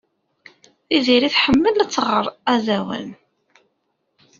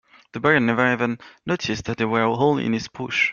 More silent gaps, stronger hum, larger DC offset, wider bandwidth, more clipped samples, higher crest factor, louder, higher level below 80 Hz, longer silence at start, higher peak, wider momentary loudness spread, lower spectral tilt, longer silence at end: neither; neither; neither; about the same, 7.6 kHz vs 7.2 kHz; neither; about the same, 18 dB vs 20 dB; first, -18 LUFS vs -21 LUFS; first, -50 dBFS vs -56 dBFS; first, 0.9 s vs 0.35 s; about the same, -2 dBFS vs -2 dBFS; about the same, 11 LU vs 9 LU; second, -2 dB/octave vs -5.5 dB/octave; first, 1.25 s vs 0 s